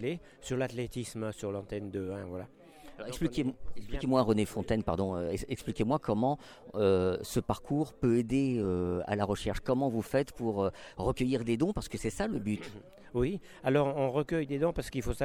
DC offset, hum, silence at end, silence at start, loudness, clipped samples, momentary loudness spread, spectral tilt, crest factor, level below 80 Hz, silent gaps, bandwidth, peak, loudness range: under 0.1%; none; 0 s; 0 s; -32 LUFS; under 0.1%; 10 LU; -6.5 dB/octave; 18 dB; -48 dBFS; none; 17.5 kHz; -14 dBFS; 5 LU